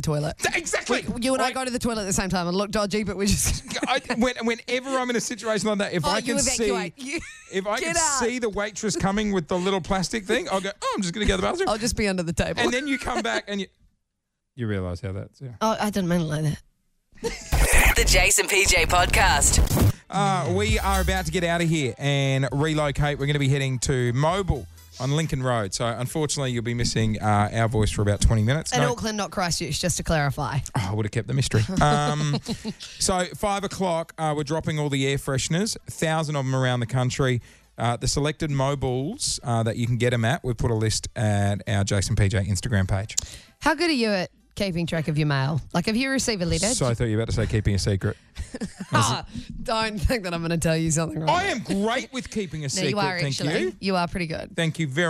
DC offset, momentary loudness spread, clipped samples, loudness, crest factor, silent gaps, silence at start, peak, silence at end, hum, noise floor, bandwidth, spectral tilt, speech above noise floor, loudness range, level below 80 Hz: under 0.1%; 7 LU; under 0.1%; -24 LUFS; 22 dB; none; 0 s; -2 dBFS; 0 s; none; -79 dBFS; 16 kHz; -4.5 dB/octave; 55 dB; 5 LU; -34 dBFS